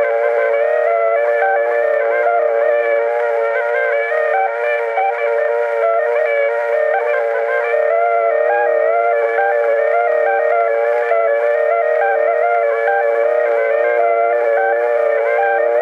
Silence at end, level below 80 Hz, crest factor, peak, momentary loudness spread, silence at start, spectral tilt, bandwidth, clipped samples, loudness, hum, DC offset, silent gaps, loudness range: 0 s; -86 dBFS; 12 dB; -4 dBFS; 2 LU; 0 s; -2 dB/octave; 5 kHz; under 0.1%; -15 LUFS; none; under 0.1%; none; 1 LU